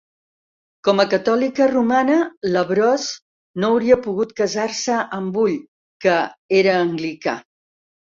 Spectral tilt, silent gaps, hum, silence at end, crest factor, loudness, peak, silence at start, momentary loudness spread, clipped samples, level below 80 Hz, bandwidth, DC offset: -4.5 dB/octave; 2.37-2.41 s, 3.22-3.54 s, 5.68-6.00 s, 6.38-6.49 s; none; 0.7 s; 18 dB; -19 LUFS; -2 dBFS; 0.85 s; 8 LU; under 0.1%; -60 dBFS; 7.6 kHz; under 0.1%